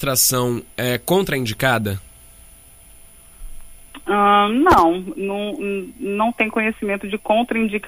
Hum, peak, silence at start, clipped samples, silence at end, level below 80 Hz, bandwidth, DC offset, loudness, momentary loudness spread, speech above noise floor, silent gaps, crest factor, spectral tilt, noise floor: none; -2 dBFS; 0 s; under 0.1%; 0 s; -42 dBFS; 15.5 kHz; under 0.1%; -19 LUFS; 12 LU; 27 dB; none; 18 dB; -4 dB/octave; -45 dBFS